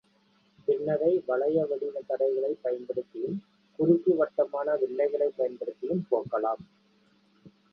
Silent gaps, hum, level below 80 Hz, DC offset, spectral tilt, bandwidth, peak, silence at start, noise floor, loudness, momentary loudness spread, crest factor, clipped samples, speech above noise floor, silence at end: none; none; -72 dBFS; under 0.1%; -10.5 dB/octave; 5.6 kHz; -10 dBFS; 0.7 s; -66 dBFS; -29 LUFS; 10 LU; 20 dB; under 0.1%; 38 dB; 0.25 s